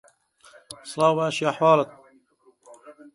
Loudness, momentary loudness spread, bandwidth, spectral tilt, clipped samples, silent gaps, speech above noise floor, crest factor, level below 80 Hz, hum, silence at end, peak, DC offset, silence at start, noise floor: -22 LUFS; 20 LU; 11.5 kHz; -5 dB/octave; under 0.1%; none; 39 dB; 20 dB; -74 dBFS; none; 0.25 s; -6 dBFS; under 0.1%; 0.7 s; -60 dBFS